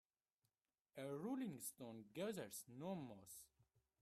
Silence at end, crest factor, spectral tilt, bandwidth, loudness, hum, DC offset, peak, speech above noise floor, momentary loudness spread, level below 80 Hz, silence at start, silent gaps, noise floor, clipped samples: 0.55 s; 16 dB; -5 dB/octave; 15.5 kHz; -52 LUFS; none; under 0.1%; -36 dBFS; over 39 dB; 12 LU; -88 dBFS; 0.95 s; none; under -90 dBFS; under 0.1%